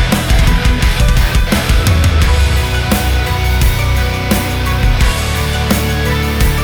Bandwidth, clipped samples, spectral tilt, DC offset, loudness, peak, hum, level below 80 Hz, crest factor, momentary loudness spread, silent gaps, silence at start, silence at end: over 20 kHz; under 0.1%; -5 dB/octave; under 0.1%; -13 LUFS; -2 dBFS; none; -14 dBFS; 10 dB; 3 LU; none; 0 s; 0 s